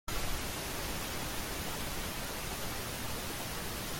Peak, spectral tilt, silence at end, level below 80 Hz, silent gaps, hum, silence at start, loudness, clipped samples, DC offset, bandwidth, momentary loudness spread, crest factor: -22 dBFS; -3 dB/octave; 0 s; -46 dBFS; none; none; 0.05 s; -38 LUFS; under 0.1%; under 0.1%; 17 kHz; 1 LU; 14 dB